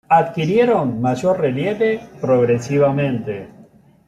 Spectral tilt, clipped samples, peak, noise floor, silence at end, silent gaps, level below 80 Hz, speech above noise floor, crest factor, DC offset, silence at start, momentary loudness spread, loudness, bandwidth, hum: -7.5 dB/octave; under 0.1%; -4 dBFS; -48 dBFS; 0.45 s; none; -56 dBFS; 31 dB; 14 dB; under 0.1%; 0.1 s; 8 LU; -18 LUFS; 12 kHz; none